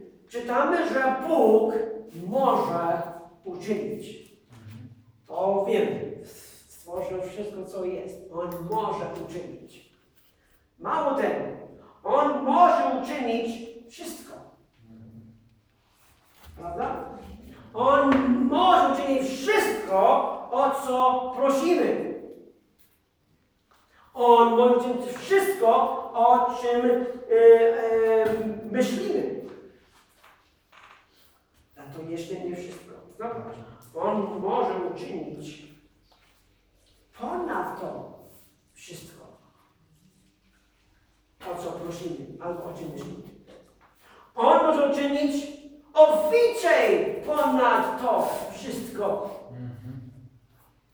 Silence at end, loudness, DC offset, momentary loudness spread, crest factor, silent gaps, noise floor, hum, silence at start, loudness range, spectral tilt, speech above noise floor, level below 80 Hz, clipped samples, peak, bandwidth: 0.65 s; -24 LUFS; under 0.1%; 22 LU; 22 dB; none; -67 dBFS; none; 0 s; 17 LU; -5 dB/octave; 43 dB; -62 dBFS; under 0.1%; -4 dBFS; over 20 kHz